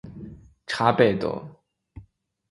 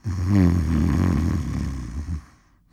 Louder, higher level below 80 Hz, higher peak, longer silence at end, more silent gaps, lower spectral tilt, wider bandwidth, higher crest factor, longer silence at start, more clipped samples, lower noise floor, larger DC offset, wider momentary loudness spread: about the same, -23 LUFS vs -23 LUFS; second, -54 dBFS vs -30 dBFS; first, -2 dBFS vs -6 dBFS; about the same, 0.5 s vs 0.45 s; neither; second, -6.5 dB/octave vs -8 dB/octave; second, 11.5 kHz vs 13 kHz; first, 24 dB vs 16 dB; about the same, 0.05 s vs 0.05 s; neither; first, -57 dBFS vs -53 dBFS; neither; first, 24 LU vs 13 LU